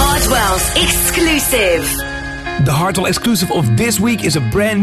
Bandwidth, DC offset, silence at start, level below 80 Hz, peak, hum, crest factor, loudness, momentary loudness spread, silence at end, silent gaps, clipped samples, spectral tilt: 14 kHz; under 0.1%; 0 s; -26 dBFS; 0 dBFS; none; 14 dB; -14 LUFS; 6 LU; 0 s; none; under 0.1%; -4 dB/octave